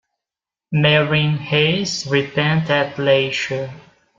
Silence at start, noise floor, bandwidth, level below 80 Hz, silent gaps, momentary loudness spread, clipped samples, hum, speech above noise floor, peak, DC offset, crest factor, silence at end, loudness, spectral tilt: 0.7 s; -88 dBFS; 7.6 kHz; -56 dBFS; none; 9 LU; under 0.1%; none; 71 dB; -2 dBFS; under 0.1%; 18 dB; 0.4 s; -18 LUFS; -5 dB/octave